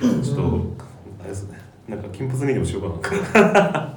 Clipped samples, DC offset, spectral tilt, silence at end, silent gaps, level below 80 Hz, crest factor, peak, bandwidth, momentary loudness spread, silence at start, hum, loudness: under 0.1%; under 0.1%; -6.5 dB/octave; 0 s; none; -44 dBFS; 18 dB; -4 dBFS; 19 kHz; 22 LU; 0 s; none; -20 LUFS